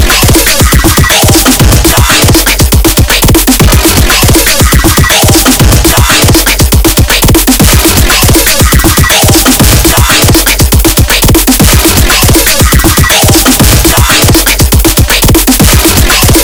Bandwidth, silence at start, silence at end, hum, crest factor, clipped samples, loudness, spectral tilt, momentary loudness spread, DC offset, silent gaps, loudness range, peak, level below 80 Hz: over 20 kHz; 0 s; 0 s; none; 4 dB; 10%; -4 LUFS; -3.5 dB/octave; 2 LU; under 0.1%; none; 0 LU; 0 dBFS; -10 dBFS